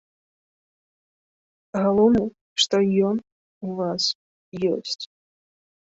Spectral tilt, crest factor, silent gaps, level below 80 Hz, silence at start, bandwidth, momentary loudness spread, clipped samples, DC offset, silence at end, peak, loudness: -5 dB/octave; 20 dB; 2.41-2.56 s, 3.32-3.61 s, 4.15-4.52 s; -58 dBFS; 1.75 s; 8 kHz; 15 LU; under 0.1%; under 0.1%; 0.9 s; -6 dBFS; -23 LUFS